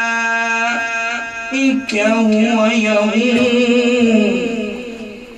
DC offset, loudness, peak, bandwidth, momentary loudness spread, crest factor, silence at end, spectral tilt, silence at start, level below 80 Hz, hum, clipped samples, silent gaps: under 0.1%; -15 LUFS; -2 dBFS; 9.6 kHz; 9 LU; 14 dB; 0 s; -4.5 dB/octave; 0 s; -52 dBFS; none; under 0.1%; none